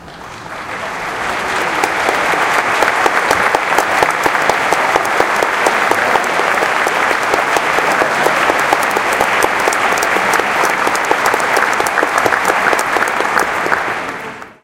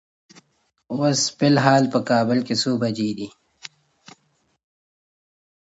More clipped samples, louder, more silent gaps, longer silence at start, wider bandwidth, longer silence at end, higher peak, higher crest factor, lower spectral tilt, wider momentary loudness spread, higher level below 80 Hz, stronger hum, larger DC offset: neither; first, -13 LUFS vs -20 LUFS; neither; second, 0 s vs 0.9 s; first, 17.5 kHz vs 8 kHz; second, 0.1 s vs 2 s; about the same, 0 dBFS vs 0 dBFS; second, 14 dB vs 22 dB; second, -2 dB/octave vs -4.5 dB/octave; second, 7 LU vs 24 LU; first, -48 dBFS vs -66 dBFS; neither; neither